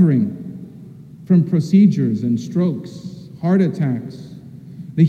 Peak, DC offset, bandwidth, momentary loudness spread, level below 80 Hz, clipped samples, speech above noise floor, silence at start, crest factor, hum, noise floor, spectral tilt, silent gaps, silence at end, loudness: -2 dBFS; under 0.1%; 7.4 kHz; 23 LU; -62 dBFS; under 0.1%; 22 dB; 0 s; 16 dB; none; -38 dBFS; -9.5 dB/octave; none; 0 s; -18 LUFS